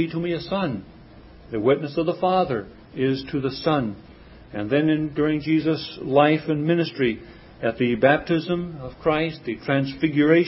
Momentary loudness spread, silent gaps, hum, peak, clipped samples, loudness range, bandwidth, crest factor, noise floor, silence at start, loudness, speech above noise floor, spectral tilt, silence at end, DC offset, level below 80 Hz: 12 LU; none; none; -2 dBFS; under 0.1%; 3 LU; 5.8 kHz; 22 dB; -46 dBFS; 0 s; -23 LUFS; 24 dB; -10.5 dB/octave; 0 s; under 0.1%; -50 dBFS